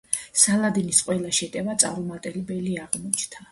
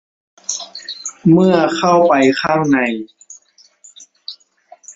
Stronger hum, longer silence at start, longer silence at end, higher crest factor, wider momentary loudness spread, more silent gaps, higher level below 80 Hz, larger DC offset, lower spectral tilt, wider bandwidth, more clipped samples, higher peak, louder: neither; second, 0.1 s vs 0.5 s; about the same, 0.1 s vs 0.05 s; first, 24 dB vs 16 dB; second, 12 LU vs 21 LU; neither; about the same, -60 dBFS vs -56 dBFS; neither; second, -3 dB/octave vs -5 dB/octave; first, 12 kHz vs 8 kHz; neither; about the same, -2 dBFS vs 0 dBFS; second, -23 LUFS vs -14 LUFS